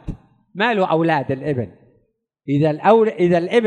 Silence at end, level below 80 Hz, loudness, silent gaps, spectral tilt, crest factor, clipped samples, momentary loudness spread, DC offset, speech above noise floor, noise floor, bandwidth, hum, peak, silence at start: 0 s; -46 dBFS; -18 LUFS; none; -7.5 dB/octave; 18 dB; under 0.1%; 21 LU; under 0.1%; 48 dB; -65 dBFS; 9.6 kHz; none; -2 dBFS; 0.05 s